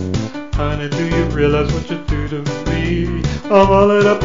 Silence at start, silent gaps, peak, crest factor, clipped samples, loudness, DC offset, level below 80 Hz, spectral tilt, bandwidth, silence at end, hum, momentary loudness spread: 0 s; none; 0 dBFS; 16 dB; under 0.1%; -16 LUFS; 1%; -26 dBFS; -7 dB/octave; 7.6 kHz; 0 s; none; 11 LU